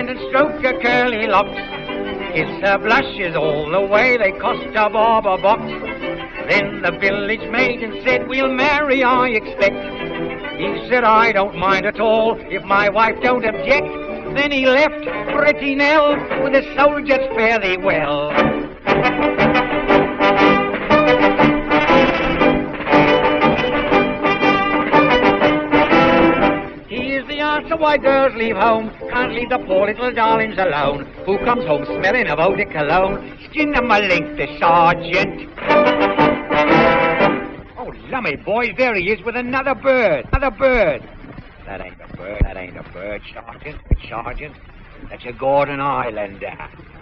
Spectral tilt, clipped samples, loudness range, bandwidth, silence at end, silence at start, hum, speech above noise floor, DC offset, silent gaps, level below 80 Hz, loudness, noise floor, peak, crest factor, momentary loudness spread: -3 dB/octave; under 0.1%; 5 LU; 7 kHz; 0 s; 0 s; none; 19 dB; under 0.1%; none; -36 dBFS; -16 LUFS; -36 dBFS; 0 dBFS; 16 dB; 13 LU